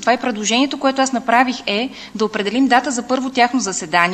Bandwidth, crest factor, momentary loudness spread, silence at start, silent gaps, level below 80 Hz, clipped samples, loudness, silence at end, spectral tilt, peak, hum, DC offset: 12 kHz; 18 dB; 6 LU; 0 s; none; -58 dBFS; under 0.1%; -17 LUFS; 0 s; -3 dB/octave; 0 dBFS; none; under 0.1%